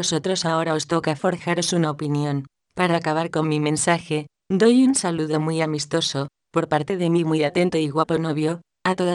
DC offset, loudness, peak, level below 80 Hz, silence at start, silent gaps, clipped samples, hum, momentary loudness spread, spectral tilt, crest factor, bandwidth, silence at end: under 0.1%; -22 LUFS; -4 dBFS; -62 dBFS; 0 s; none; under 0.1%; none; 7 LU; -5 dB/octave; 16 dB; 12 kHz; 0 s